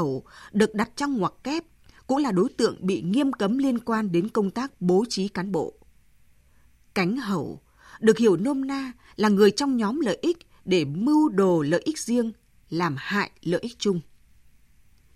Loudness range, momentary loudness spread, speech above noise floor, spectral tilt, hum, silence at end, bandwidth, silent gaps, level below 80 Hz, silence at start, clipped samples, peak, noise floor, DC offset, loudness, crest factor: 5 LU; 11 LU; 33 dB; -6 dB/octave; none; 1.15 s; 13.5 kHz; none; -60 dBFS; 0 s; under 0.1%; -4 dBFS; -57 dBFS; under 0.1%; -25 LUFS; 20 dB